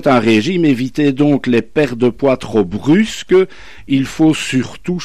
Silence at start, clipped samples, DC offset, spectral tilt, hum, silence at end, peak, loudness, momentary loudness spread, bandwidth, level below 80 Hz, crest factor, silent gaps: 0.05 s; under 0.1%; 2%; -6 dB/octave; none; 0 s; -2 dBFS; -14 LUFS; 5 LU; 13.5 kHz; -44 dBFS; 12 dB; none